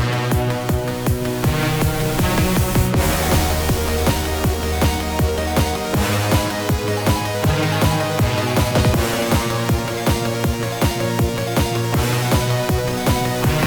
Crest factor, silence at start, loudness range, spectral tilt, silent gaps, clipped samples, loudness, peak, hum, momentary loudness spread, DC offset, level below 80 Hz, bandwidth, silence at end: 16 dB; 0 s; 1 LU; -5 dB/octave; none; under 0.1%; -19 LUFS; -4 dBFS; none; 3 LU; under 0.1%; -28 dBFS; over 20 kHz; 0 s